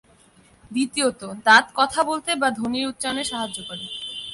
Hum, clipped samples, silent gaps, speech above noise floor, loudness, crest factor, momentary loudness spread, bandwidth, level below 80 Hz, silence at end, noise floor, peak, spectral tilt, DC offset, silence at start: none; under 0.1%; none; 33 dB; -22 LUFS; 20 dB; 15 LU; 12 kHz; -58 dBFS; 0 s; -55 dBFS; -2 dBFS; -2 dB/octave; under 0.1%; 0.7 s